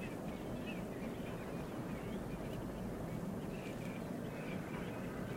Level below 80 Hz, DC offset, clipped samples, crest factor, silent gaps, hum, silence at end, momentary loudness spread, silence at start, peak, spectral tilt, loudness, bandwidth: -56 dBFS; under 0.1%; under 0.1%; 12 dB; none; none; 0 s; 1 LU; 0 s; -30 dBFS; -6.5 dB/octave; -44 LUFS; 16 kHz